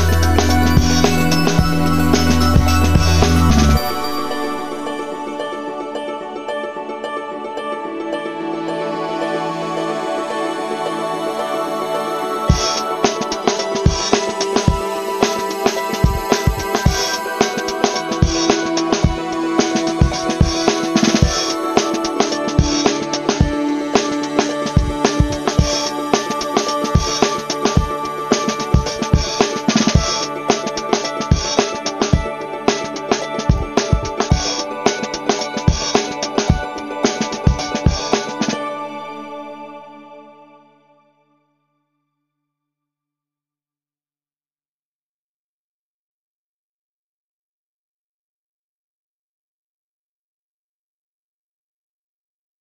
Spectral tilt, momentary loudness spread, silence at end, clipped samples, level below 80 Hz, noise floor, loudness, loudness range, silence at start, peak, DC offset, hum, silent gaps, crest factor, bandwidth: -4.5 dB/octave; 10 LU; 12.15 s; under 0.1%; -28 dBFS; under -90 dBFS; -18 LUFS; 8 LU; 0 s; 0 dBFS; under 0.1%; none; none; 18 dB; 15.5 kHz